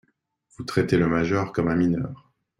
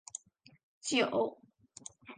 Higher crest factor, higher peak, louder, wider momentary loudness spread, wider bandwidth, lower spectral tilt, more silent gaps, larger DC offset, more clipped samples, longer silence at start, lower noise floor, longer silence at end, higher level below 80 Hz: about the same, 18 dB vs 22 dB; first, -6 dBFS vs -16 dBFS; first, -23 LUFS vs -33 LUFS; second, 9 LU vs 20 LU; first, 12 kHz vs 9.6 kHz; first, -7.5 dB/octave vs -2.5 dB/octave; second, none vs 0.63-0.81 s; neither; neither; first, 0.6 s vs 0.15 s; first, -68 dBFS vs -55 dBFS; first, 0.45 s vs 0.05 s; first, -52 dBFS vs -80 dBFS